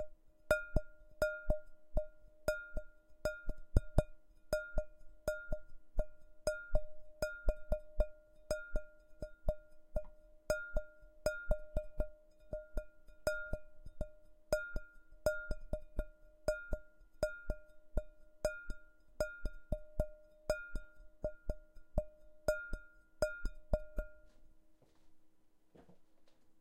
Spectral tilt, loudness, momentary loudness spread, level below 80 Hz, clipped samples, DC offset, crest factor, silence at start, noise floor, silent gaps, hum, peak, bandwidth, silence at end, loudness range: -5.5 dB/octave; -43 LUFS; 12 LU; -44 dBFS; under 0.1%; under 0.1%; 28 dB; 0 s; -65 dBFS; none; none; -12 dBFS; 16 kHz; 0.1 s; 4 LU